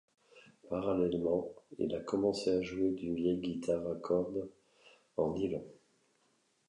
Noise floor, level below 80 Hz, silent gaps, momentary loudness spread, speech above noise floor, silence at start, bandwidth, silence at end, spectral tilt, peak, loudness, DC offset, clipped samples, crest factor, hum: -74 dBFS; -64 dBFS; none; 10 LU; 40 dB; 0.35 s; 11 kHz; 0.95 s; -7 dB/octave; -18 dBFS; -35 LUFS; under 0.1%; under 0.1%; 18 dB; none